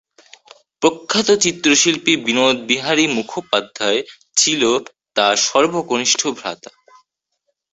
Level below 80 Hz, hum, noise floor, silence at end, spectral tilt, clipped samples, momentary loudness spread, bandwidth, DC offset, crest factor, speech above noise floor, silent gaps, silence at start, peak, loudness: -60 dBFS; none; -72 dBFS; 1.15 s; -1.5 dB/octave; under 0.1%; 9 LU; 8.4 kHz; under 0.1%; 18 dB; 55 dB; none; 0.8 s; 0 dBFS; -16 LUFS